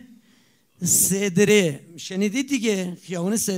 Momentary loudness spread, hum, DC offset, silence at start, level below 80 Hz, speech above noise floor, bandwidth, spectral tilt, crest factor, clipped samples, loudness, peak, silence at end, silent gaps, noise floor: 12 LU; none; under 0.1%; 0.8 s; -64 dBFS; 38 dB; 16 kHz; -3.5 dB/octave; 18 dB; under 0.1%; -21 LUFS; -6 dBFS; 0 s; none; -60 dBFS